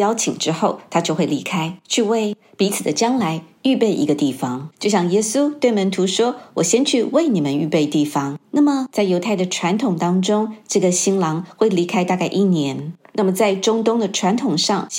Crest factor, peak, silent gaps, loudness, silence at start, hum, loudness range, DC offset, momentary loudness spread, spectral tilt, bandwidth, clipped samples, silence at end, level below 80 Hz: 16 dB; -2 dBFS; none; -19 LUFS; 0 s; none; 2 LU; under 0.1%; 5 LU; -4.5 dB/octave; 16.5 kHz; under 0.1%; 0 s; -72 dBFS